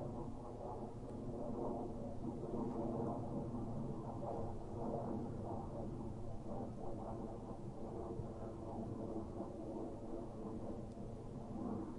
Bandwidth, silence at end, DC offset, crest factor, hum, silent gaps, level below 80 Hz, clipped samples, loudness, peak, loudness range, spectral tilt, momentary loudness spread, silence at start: 11 kHz; 0 s; under 0.1%; 14 dB; none; none; -56 dBFS; under 0.1%; -46 LUFS; -30 dBFS; 3 LU; -9 dB/octave; 6 LU; 0 s